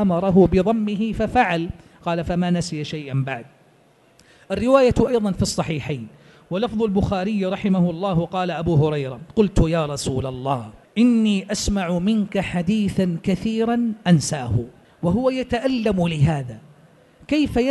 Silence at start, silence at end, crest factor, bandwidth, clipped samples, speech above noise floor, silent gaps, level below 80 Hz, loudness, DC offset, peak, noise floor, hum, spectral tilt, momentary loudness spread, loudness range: 0 s; 0 s; 18 dB; 12 kHz; under 0.1%; 35 dB; none; -38 dBFS; -21 LUFS; under 0.1%; -2 dBFS; -55 dBFS; none; -6.5 dB/octave; 10 LU; 2 LU